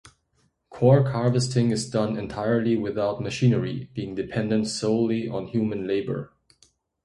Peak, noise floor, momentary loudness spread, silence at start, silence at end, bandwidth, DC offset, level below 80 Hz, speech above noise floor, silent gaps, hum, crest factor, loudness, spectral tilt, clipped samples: -4 dBFS; -69 dBFS; 11 LU; 0.7 s; 0.8 s; 11.5 kHz; under 0.1%; -56 dBFS; 45 dB; none; none; 20 dB; -24 LUFS; -6.5 dB/octave; under 0.1%